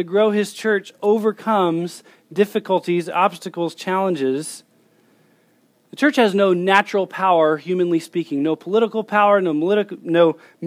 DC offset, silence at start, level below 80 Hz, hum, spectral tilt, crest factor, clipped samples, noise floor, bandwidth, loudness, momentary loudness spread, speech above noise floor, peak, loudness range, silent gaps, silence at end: under 0.1%; 0 s; -80 dBFS; none; -5.5 dB/octave; 18 dB; under 0.1%; -59 dBFS; 16 kHz; -19 LUFS; 9 LU; 41 dB; 0 dBFS; 5 LU; none; 0 s